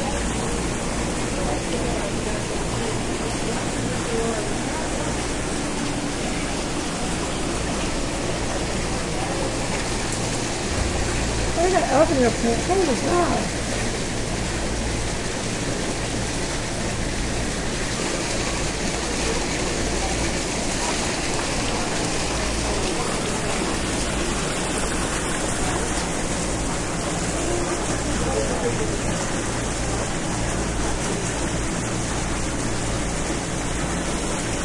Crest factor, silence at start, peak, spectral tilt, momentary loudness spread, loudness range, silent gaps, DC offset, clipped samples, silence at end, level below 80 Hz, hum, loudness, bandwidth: 20 dB; 0 s; -4 dBFS; -4 dB/octave; 4 LU; 4 LU; none; under 0.1%; under 0.1%; 0 s; -32 dBFS; none; -24 LUFS; 11.5 kHz